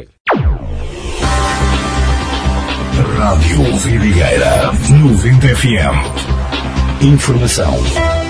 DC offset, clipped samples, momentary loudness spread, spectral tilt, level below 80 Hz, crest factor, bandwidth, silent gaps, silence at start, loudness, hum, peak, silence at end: under 0.1%; under 0.1%; 8 LU; -5.5 dB/octave; -18 dBFS; 12 dB; 11 kHz; 0.20-0.25 s; 0 s; -12 LUFS; none; 0 dBFS; 0 s